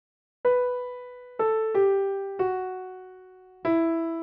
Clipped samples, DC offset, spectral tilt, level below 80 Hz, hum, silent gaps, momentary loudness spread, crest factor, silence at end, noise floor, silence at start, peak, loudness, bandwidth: under 0.1%; under 0.1%; -5.5 dB/octave; -68 dBFS; none; none; 18 LU; 14 dB; 0 s; -50 dBFS; 0.45 s; -14 dBFS; -26 LUFS; 4.3 kHz